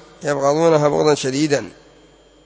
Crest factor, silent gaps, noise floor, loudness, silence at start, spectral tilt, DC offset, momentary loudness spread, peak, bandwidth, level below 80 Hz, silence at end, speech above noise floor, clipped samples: 18 dB; none; -49 dBFS; -17 LUFS; 0.2 s; -5 dB/octave; under 0.1%; 8 LU; -2 dBFS; 8 kHz; -56 dBFS; 0.75 s; 33 dB; under 0.1%